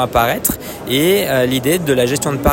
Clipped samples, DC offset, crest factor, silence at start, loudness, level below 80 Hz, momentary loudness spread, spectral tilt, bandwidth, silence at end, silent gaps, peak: under 0.1%; under 0.1%; 14 dB; 0 s; -15 LUFS; -34 dBFS; 5 LU; -4 dB/octave; 17 kHz; 0 s; none; 0 dBFS